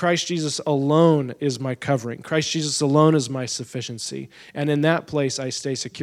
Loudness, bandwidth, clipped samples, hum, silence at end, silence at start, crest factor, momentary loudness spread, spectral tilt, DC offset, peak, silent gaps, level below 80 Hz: -22 LUFS; 13.5 kHz; under 0.1%; none; 0 s; 0 s; 18 dB; 12 LU; -5 dB/octave; under 0.1%; -4 dBFS; none; -66 dBFS